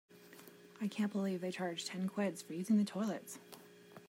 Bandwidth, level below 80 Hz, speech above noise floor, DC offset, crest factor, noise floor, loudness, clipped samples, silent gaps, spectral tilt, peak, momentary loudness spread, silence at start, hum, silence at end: 16 kHz; -88 dBFS; 21 dB; under 0.1%; 16 dB; -58 dBFS; -38 LUFS; under 0.1%; none; -5.5 dB/octave; -24 dBFS; 23 LU; 0.1 s; none; 0 s